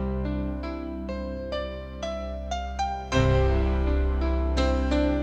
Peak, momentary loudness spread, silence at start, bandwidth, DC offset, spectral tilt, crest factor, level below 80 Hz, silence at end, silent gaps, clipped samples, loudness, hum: -10 dBFS; 10 LU; 0 s; 8 kHz; under 0.1%; -7 dB/octave; 16 dB; -28 dBFS; 0 s; none; under 0.1%; -28 LUFS; none